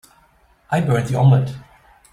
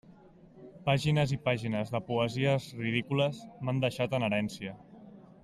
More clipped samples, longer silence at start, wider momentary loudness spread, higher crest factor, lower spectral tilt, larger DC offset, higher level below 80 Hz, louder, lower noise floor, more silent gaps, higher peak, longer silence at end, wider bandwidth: neither; first, 0.7 s vs 0.1 s; first, 13 LU vs 9 LU; about the same, 16 dB vs 20 dB; first, -8 dB/octave vs -6.5 dB/octave; neither; first, -50 dBFS vs -62 dBFS; first, -18 LUFS vs -31 LUFS; about the same, -56 dBFS vs -56 dBFS; neither; first, -4 dBFS vs -12 dBFS; first, 0.5 s vs 0.2 s; second, 11.5 kHz vs 13 kHz